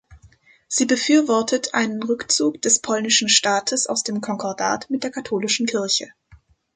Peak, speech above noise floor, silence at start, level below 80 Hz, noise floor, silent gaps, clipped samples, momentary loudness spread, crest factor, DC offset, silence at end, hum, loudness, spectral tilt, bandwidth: -2 dBFS; 32 dB; 0.1 s; -60 dBFS; -53 dBFS; none; under 0.1%; 9 LU; 20 dB; under 0.1%; 0.4 s; none; -20 LUFS; -1.5 dB/octave; 9.6 kHz